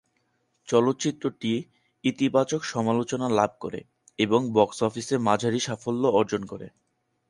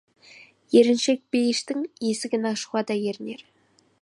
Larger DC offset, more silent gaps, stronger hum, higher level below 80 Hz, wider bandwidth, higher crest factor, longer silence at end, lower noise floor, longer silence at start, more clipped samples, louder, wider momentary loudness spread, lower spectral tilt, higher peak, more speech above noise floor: neither; neither; neither; first, -64 dBFS vs -76 dBFS; about the same, 11.5 kHz vs 11.5 kHz; about the same, 22 dB vs 20 dB; about the same, 0.6 s vs 0.6 s; first, -72 dBFS vs -51 dBFS; about the same, 0.65 s vs 0.7 s; neither; about the same, -25 LUFS vs -24 LUFS; about the same, 13 LU vs 12 LU; about the same, -5 dB/octave vs -4 dB/octave; about the same, -4 dBFS vs -6 dBFS; first, 47 dB vs 28 dB